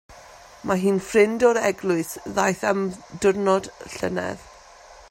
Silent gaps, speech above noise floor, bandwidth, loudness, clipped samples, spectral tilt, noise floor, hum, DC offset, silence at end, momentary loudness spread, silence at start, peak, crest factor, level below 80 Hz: none; 25 dB; 16 kHz; -22 LUFS; under 0.1%; -5 dB/octave; -47 dBFS; none; under 0.1%; 0.15 s; 11 LU; 0.1 s; -4 dBFS; 18 dB; -56 dBFS